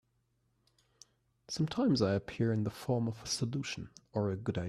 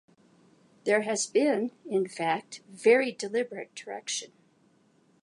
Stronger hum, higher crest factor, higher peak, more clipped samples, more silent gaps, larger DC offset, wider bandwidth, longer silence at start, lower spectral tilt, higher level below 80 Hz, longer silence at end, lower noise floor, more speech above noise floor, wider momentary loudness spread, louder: neither; about the same, 18 dB vs 20 dB; second, -18 dBFS vs -10 dBFS; neither; neither; neither; first, 14 kHz vs 11.5 kHz; first, 1.5 s vs 0.85 s; first, -6 dB/octave vs -3 dB/octave; first, -64 dBFS vs -86 dBFS; second, 0 s vs 0.95 s; first, -77 dBFS vs -65 dBFS; first, 43 dB vs 37 dB; second, 10 LU vs 15 LU; second, -34 LUFS vs -28 LUFS